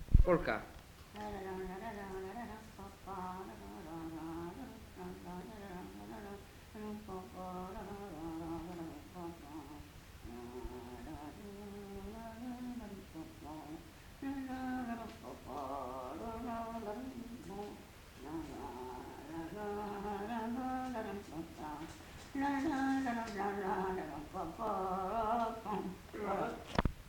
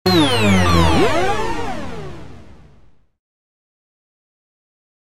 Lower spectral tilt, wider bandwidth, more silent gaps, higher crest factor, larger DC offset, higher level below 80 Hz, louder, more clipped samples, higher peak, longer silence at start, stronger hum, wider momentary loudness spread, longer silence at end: first, -6.5 dB/octave vs -5 dB/octave; first, 19 kHz vs 16 kHz; neither; first, 28 dB vs 18 dB; neither; second, -48 dBFS vs -34 dBFS; second, -43 LUFS vs -16 LUFS; neither; second, -12 dBFS vs -2 dBFS; about the same, 0 s vs 0.05 s; neither; second, 13 LU vs 19 LU; second, 0 s vs 1.95 s